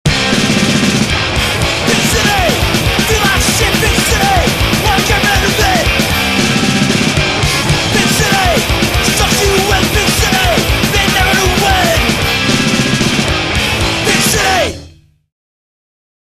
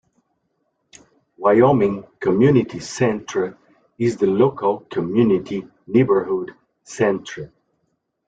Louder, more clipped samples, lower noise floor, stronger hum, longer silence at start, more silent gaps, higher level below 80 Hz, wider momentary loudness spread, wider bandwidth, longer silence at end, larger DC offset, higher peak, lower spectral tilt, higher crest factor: first, -11 LUFS vs -19 LUFS; neither; second, -39 dBFS vs -71 dBFS; neither; second, 0.05 s vs 1.4 s; neither; first, -22 dBFS vs -56 dBFS; second, 2 LU vs 14 LU; first, 14.5 kHz vs 9 kHz; first, 1.4 s vs 0.8 s; first, 0.5% vs under 0.1%; about the same, 0 dBFS vs -2 dBFS; second, -3.5 dB/octave vs -7 dB/octave; second, 12 dB vs 18 dB